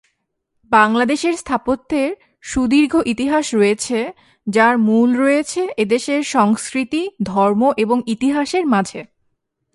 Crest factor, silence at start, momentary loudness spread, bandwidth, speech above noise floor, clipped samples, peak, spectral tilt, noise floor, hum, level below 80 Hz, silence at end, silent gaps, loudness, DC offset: 16 dB; 0.7 s; 8 LU; 11.5 kHz; 55 dB; under 0.1%; 0 dBFS; -4.5 dB/octave; -71 dBFS; none; -50 dBFS; 0.7 s; none; -17 LUFS; under 0.1%